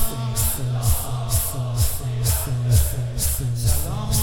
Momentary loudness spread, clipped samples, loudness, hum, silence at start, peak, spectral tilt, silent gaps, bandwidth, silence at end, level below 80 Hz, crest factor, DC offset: 4 LU; under 0.1%; -22 LUFS; none; 0 s; -6 dBFS; -4 dB/octave; none; 18 kHz; 0 s; -28 dBFS; 16 dB; under 0.1%